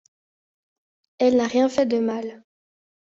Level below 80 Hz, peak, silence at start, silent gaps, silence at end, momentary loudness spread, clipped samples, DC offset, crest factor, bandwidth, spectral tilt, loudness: -66 dBFS; -8 dBFS; 1.2 s; none; 0.75 s; 11 LU; under 0.1%; under 0.1%; 16 dB; 7.8 kHz; -5 dB/octave; -21 LUFS